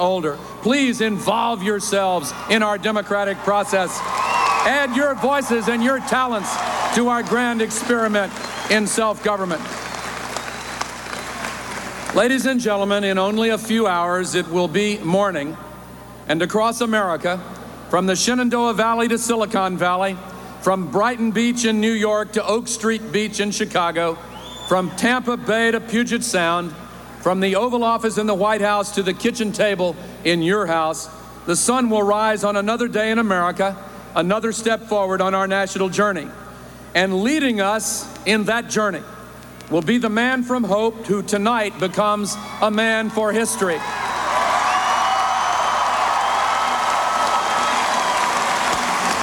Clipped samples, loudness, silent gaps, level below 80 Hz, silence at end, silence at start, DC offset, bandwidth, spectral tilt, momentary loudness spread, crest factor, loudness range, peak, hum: under 0.1%; -19 LUFS; none; -52 dBFS; 0 s; 0 s; under 0.1%; 16.5 kHz; -3.5 dB/octave; 10 LU; 16 dB; 2 LU; -4 dBFS; none